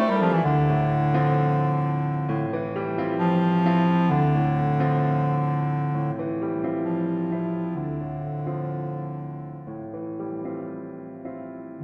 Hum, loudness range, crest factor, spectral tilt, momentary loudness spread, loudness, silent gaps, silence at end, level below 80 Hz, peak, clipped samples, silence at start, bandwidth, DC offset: none; 10 LU; 16 dB; -10 dB/octave; 15 LU; -24 LUFS; none; 0 s; -52 dBFS; -8 dBFS; under 0.1%; 0 s; 5 kHz; under 0.1%